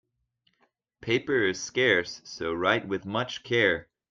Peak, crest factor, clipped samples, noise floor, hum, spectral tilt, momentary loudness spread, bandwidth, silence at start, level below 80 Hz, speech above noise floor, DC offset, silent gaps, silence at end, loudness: -8 dBFS; 22 dB; under 0.1%; -73 dBFS; none; -4 dB/octave; 10 LU; 7.6 kHz; 1 s; -64 dBFS; 46 dB; under 0.1%; none; 0.3 s; -26 LUFS